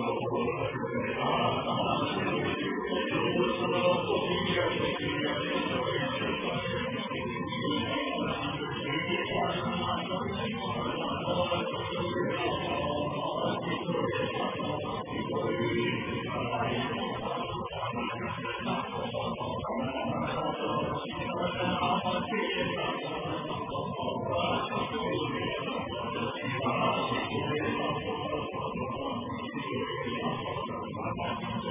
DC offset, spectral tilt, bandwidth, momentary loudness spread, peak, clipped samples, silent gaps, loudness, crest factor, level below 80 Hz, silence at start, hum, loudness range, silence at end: under 0.1%; -3.5 dB/octave; 3.8 kHz; 6 LU; -16 dBFS; under 0.1%; none; -31 LUFS; 16 dB; -54 dBFS; 0 s; none; 4 LU; 0 s